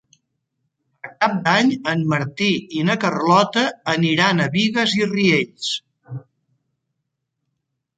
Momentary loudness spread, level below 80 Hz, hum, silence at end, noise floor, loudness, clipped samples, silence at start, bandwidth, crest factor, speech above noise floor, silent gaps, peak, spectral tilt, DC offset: 17 LU; -64 dBFS; none; 1.8 s; -77 dBFS; -18 LUFS; under 0.1%; 1.05 s; 9.2 kHz; 20 dB; 59 dB; none; -2 dBFS; -5 dB/octave; under 0.1%